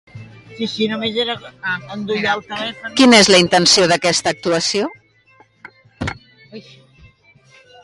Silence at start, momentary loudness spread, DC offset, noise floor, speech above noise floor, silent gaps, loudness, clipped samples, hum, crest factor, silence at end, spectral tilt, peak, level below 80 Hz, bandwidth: 0.15 s; 17 LU; under 0.1%; -52 dBFS; 36 dB; none; -15 LUFS; under 0.1%; none; 18 dB; 1.25 s; -3 dB/octave; 0 dBFS; -50 dBFS; 11.5 kHz